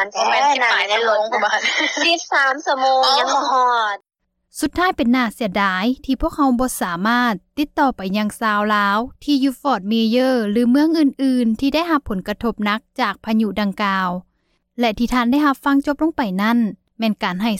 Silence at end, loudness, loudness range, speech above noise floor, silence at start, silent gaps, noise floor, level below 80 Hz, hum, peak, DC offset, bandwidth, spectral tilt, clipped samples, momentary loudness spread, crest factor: 0 s; -18 LUFS; 4 LU; 42 dB; 0 s; none; -60 dBFS; -44 dBFS; none; -4 dBFS; under 0.1%; 16 kHz; -4 dB/octave; under 0.1%; 7 LU; 14 dB